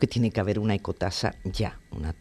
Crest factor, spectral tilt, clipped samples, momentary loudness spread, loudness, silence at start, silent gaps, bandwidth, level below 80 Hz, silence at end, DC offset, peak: 20 dB; -6.5 dB/octave; under 0.1%; 8 LU; -28 LUFS; 0 s; none; 13 kHz; -42 dBFS; 0.05 s; under 0.1%; -8 dBFS